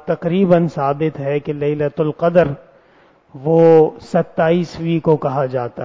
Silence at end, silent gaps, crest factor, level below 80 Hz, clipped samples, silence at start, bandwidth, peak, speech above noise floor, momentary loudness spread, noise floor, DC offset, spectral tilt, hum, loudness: 0 s; none; 14 dB; -50 dBFS; under 0.1%; 0.05 s; 7.6 kHz; -2 dBFS; 36 dB; 9 LU; -51 dBFS; under 0.1%; -9 dB/octave; none; -16 LUFS